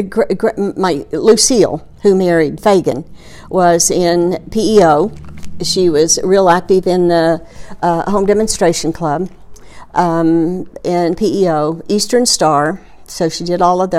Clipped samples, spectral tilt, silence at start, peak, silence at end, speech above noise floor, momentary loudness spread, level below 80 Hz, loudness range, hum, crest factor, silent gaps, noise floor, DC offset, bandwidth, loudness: under 0.1%; -4 dB/octave; 0 s; 0 dBFS; 0 s; 19 dB; 9 LU; -40 dBFS; 3 LU; none; 14 dB; none; -32 dBFS; under 0.1%; 15.5 kHz; -13 LUFS